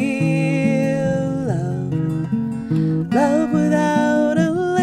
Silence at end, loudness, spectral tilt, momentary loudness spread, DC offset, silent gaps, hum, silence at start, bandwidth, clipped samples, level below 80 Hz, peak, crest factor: 0 s; -19 LUFS; -7.5 dB/octave; 5 LU; under 0.1%; none; none; 0 s; 10.5 kHz; under 0.1%; -54 dBFS; -4 dBFS; 14 dB